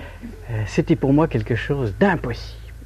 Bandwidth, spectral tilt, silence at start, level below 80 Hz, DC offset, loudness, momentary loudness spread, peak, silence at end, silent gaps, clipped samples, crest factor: 13.5 kHz; -7.5 dB/octave; 0 s; -36 dBFS; under 0.1%; -21 LUFS; 17 LU; -4 dBFS; 0 s; none; under 0.1%; 18 dB